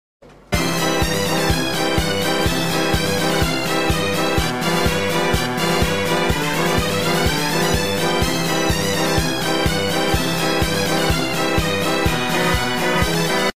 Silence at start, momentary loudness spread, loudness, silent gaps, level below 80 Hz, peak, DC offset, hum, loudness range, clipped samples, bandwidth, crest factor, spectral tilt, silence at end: 0.2 s; 1 LU; -18 LUFS; none; -32 dBFS; -4 dBFS; 3%; none; 0 LU; under 0.1%; 16 kHz; 14 dB; -4 dB/octave; 0.05 s